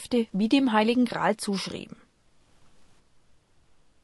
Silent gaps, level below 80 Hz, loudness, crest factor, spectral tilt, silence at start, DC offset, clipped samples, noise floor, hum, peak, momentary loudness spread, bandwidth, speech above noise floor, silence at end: none; -64 dBFS; -25 LUFS; 20 dB; -5 dB/octave; 0 s; under 0.1%; under 0.1%; -61 dBFS; none; -8 dBFS; 14 LU; 12 kHz; 37 dB; 2.2 s